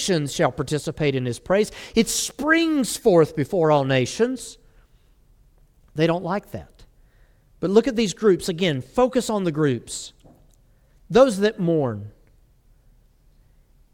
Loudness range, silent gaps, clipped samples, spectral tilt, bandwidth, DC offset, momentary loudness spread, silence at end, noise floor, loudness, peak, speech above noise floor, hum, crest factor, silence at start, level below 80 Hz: 6 LU; none; under 0.1%; -5 dB/octave; 17.5 kHz; under 0.1%; 13 LU; 1.85 s; -56 dBFS; -21 LUFS; -2 dBFS; 35 dB; none; 20 dB; 0 s; -50 dBFS